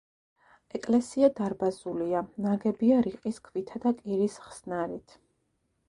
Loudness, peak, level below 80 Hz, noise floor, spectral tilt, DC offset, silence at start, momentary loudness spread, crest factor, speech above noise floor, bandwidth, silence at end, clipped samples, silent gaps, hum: -29 LUFS; -10 dBFS; -66 dBFS; -75 dBFS; -7 dB/octave; under 0.1%; 0.75 s; 12 LU; 20 dB; 47 dB; 11 kHz; 0.9 s; under 0.1%; none; none